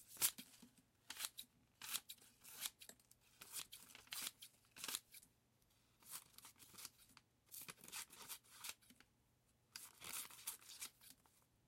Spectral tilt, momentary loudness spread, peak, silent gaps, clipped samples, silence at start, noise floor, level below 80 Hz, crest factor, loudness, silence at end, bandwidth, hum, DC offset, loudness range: 1 dB/octave; 17 LU; -22 dBFS; none; under 0.1%; 0 s; -79 dBFS; -86 dBFS; 34 dB; -50 LUFS; 0.25 s; 16.5 kHz; none; under 0.1%; 5 LU